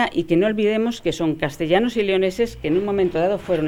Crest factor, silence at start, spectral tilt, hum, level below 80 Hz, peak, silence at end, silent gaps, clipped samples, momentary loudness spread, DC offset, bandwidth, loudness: 16 dB; 0 s; -6 dB/octave; none; -46 dBFS; -4 dBFS; 0 s; none; under 0.1%; 4 LU; under 0.1%; 15.5 kHz; -20 LUFS